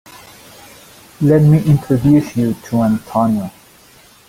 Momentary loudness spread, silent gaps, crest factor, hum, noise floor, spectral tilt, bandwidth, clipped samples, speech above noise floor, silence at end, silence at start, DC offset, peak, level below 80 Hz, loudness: 8 LU; none; 14 dB; none; -46 dBFS; -8.5 dB/octave; 16 kHz; under 0.1%; 33 dB; 0.8 s; 1.2 s; under 0.1%; -2 dBFS; -44 dBFS; -14 LUFS